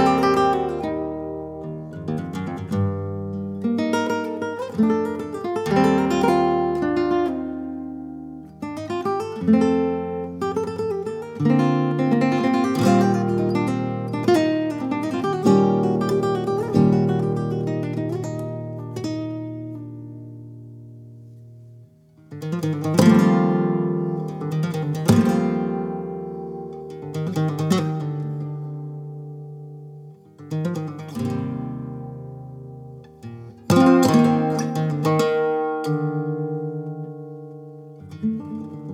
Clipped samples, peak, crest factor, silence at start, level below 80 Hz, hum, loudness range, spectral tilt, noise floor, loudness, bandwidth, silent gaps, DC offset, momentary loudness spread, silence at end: under 0.1%; -2 dBFS; 20 dB; 0 s; -54 dBFS; none; 11 LU; -7 dB/octave; -50 dBFS; -22 LUFS; 16.5 kHz; none; under 0.1%; 19 LU; 0 s